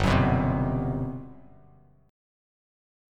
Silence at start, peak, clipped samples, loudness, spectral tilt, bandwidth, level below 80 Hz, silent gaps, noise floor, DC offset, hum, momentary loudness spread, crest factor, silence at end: 0 s; -8 dBFS; under 0.1%; -26 LUFS; -7.5 dB/octave; 11 kHz; -40 dBFS; none; -57 dBFS; under 0.1%; 50 Hz at -55 dBFS; 17 LU; 20 dB; 1.75 s